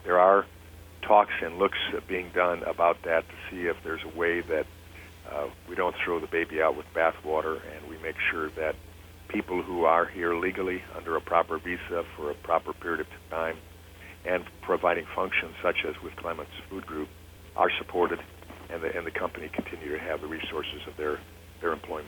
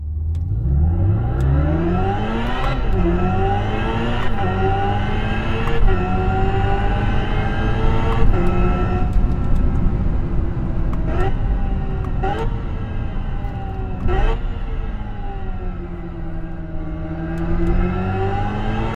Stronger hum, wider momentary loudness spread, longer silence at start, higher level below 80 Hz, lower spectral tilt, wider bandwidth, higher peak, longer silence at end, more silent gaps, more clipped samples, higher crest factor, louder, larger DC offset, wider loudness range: neither; first, 15 LU vs 10 LU; about the same, 0 s vs 0 s; second, -54 dBFS vs -22 dBFS; second, -5.5 dB/octave vs -8.5 dB/octave; first, 19.5 kHz vs 5.4 kHz; second, -6 dBFS vs 0 dBFS; about the same, 0 s vs 0 s; neither; neither; first, 24 dB vs 18 dB; second, -29 LUFS vs -22 LUFS; neither; about the same, 5 LU vs 7 LU